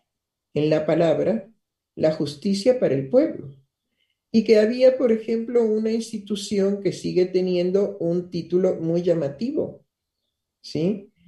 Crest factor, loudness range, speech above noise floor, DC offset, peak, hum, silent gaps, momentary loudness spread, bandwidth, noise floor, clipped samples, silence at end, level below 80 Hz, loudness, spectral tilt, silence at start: 18 dB; 3 LU; 61 dB; under 0.1%; -6 dBFS; none; none; 9 LU; 12 kHz; -82 dBFS; under 0.1%; 0.2 s; -64 dBFS; -22 LUFS; -7 dB/octave; 0.55 s